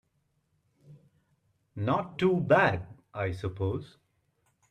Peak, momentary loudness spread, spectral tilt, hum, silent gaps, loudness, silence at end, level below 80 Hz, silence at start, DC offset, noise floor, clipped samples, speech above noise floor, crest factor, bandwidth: -10 dBFS; 15 LU; -8 dB/octave; none; none; -29 LUFS; 0.85 s; -62 dBFS; 0.9 s; under 0.1%; -75 dBFS; under 0.1%; 47 dB; 22 dB; 10 kHz